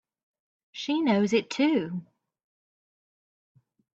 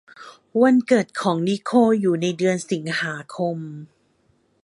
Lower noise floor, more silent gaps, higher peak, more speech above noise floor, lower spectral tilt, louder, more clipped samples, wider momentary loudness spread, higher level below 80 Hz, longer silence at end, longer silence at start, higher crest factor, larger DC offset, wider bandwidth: first, under -90 dBFS vs -64 dBFS; neither; second, -12 dBFS vs -4 dBFS; first, over 65 dB vs 43 dB; about the same, -5.5 dB/octave vs -6 dB/octave; second, -26 LUFS vs -21 LUFS; neither; first, 14 LU vs 11 LU; about the same, -74 dBFS vs -70 dBFS; first, 1.9 s vs 0.8 s; first, 0.75 s vs 0.2 s; about the same, 18 dB vs 18 dB; neither; second, 8 kHz vs 11.5 kHz